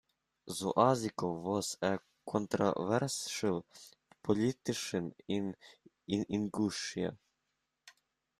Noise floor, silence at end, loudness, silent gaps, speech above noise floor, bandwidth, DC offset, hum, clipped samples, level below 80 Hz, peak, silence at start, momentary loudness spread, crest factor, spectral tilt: -84 dBFS; 0.5 s; -35 LUFS; none; 50 dB; 14.5 kHz; under 0.1%; none; under 0.1%; -72 dBFS; -14 dBFS; 0.45 s; 11 LU; 22 dB; -5 dB/octave